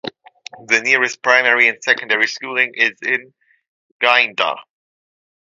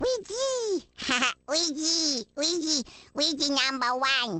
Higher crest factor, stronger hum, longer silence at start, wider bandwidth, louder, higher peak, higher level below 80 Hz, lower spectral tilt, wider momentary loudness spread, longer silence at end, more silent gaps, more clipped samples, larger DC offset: about the same, 18 dB vs 20 dB; neither; about the same, 0.05 s vs 0 s; about the same, 9.8 kHz vs 9.4 kHz; first, -15 LUFS vs -26 LUFS; first, 0 dBFS vs -8 dBFS; second, -72 dBFS vs -62 dBFS; about the same, -1 dB/octave vs -1 dB/octave; about the same, 8 LU vs 6 LU; first, 0.8 s vs 0 s; first, 3.68-4.00 s vs none; neither; neither